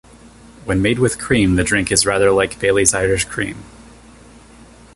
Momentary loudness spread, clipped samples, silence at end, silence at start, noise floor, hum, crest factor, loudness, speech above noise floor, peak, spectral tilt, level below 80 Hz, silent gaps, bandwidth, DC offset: 10 LU; under 0.1%; 1.25 s; 0.65 s; -43 dBFS; none; 18 dB; -16 LUFS; 27 dB; 0 dBFS; -4 dB/octave; -36 dBFS; none; 12 kHz; under 0.1%